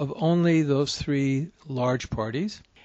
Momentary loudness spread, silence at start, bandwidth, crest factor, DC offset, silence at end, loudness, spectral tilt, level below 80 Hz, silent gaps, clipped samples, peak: 9 LU; 0 s; 8.2 kHz; 14 dB; under 0.1%; 0.25 s; -25 LUFS; -6.5 dB/octave; -50 dBFS; none; under 0.1%; -12 dBFS